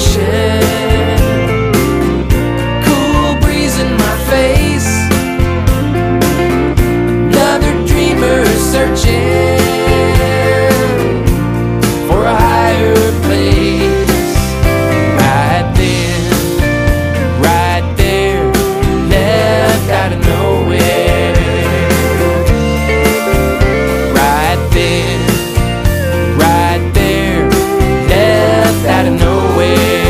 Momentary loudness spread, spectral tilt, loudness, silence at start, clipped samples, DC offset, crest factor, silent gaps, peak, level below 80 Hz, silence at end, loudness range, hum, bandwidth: 3 LU; -5.5 dB/octave; -11 LUFS; 0 s; under 0.1%; under 0.1%; 10 dB; none; 0 dBFS; -18 dBFS; 0 s; 1 LU; none; 16 kHz